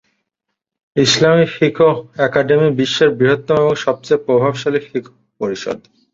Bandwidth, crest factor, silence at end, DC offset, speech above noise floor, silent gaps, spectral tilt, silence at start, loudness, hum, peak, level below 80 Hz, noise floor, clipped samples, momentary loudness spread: 7.8 kHz; 14 dB; 0.35 s; under 0.1%; 63 dB; none; -5 dB/octave; 0.95 s; -15 LUFS; none; -2 dBFS; -56 dBFS; -78 dBFS; under 0.1%; 12 LU